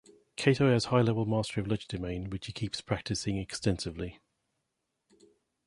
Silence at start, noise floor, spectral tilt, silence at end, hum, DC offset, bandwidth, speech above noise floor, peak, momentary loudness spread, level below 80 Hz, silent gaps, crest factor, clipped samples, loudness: 0.4 s; -83 dBFS; -5.5 dB/octave; 1.5 s; none; under 0.1%; 11.5 kHz; 53 dB; -8 dBFS; 12 LU; -52 dBFS; none; 24 dB; under 0.1%; -31 LUFS